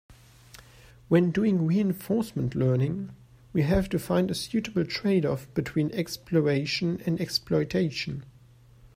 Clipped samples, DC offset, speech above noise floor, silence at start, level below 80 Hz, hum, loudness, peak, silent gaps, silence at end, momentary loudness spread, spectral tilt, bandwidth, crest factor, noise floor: under 0.1%; under 0.1%; 28 dB; 0.1 s; -48 dBFS; none; -27 LUFS; -10 dBFS; none; 0.1 s; 7 LU; -6.5 dB/octave; 16 kHz; 18 dB; -54 dBFS